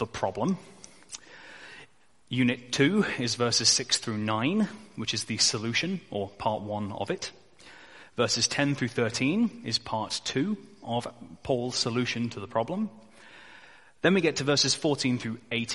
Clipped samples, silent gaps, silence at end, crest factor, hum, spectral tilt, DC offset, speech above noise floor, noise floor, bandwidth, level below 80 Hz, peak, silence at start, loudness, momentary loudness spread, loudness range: under 0.1%; none; 0 s; 22 dB; none; -3.5 dB/octave; 0.1%; 29 dB; -57 dBFS; 11.5 kHz; -62 dBFS; -6 dBFS; 0 s; -28 LUFS; 13 LU; 5 LU